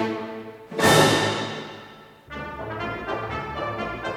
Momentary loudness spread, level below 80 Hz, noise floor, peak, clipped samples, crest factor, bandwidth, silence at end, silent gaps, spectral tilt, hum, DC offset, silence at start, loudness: 22 LU; -50 dBFS; -46 dBFS; -4 dBFS; under 0.1%; 22 dB; 18 kHz; 0 s; none; -4 dB/octave; none; under 0.1%; 0 s; -23 LUFS